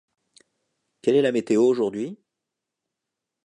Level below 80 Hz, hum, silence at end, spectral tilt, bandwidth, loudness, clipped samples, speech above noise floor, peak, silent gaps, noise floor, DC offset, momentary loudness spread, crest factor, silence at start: -76 dBFS; none; 1.3 s; -6 dB/octave; 10.5 kHz; -22 LUFS; under 0.1%; 64 dB; -8 dBFS; none; -85 dBFS; under 0.1%; 11 LU; 18 dB; 1.05 s